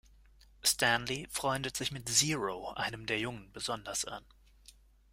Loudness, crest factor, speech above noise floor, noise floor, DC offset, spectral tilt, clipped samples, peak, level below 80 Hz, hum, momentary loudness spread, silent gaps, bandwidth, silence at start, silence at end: -33 LUFS; 24 dB; 26 dB; -61 dBFS; under 0.1%; -2 dB/octave; under 0.1%; -12 dBFS; -60 dBFS; none; 11 LU; none; 16 kHz; 0.65 s; 0.4 s